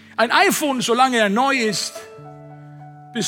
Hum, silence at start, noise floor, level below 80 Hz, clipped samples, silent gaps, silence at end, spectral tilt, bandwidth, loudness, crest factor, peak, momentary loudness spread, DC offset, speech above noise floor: none; 0.2 s; -40 dBFS; -74 dBFS; under 0.1%; none; 0 s; -3 dB/octave; 17.5 kHz; -17 LUFS; 18 dB; -2 dBFS; 15 LU; under 0.1%; 22 dB